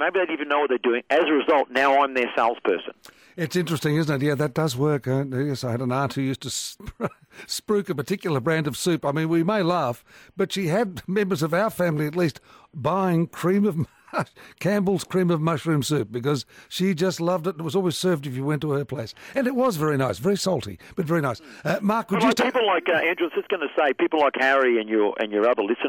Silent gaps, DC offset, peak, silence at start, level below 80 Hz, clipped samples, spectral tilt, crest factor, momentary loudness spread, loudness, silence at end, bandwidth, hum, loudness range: none; under 0.1%; -10 dBFS; 0 s; -60 dBFS; under 0.1%; -5.5 dB/octave; 14 dB; 9 LU; -23 LUFS; 0 s; 17.5 kHz; none; 4 LU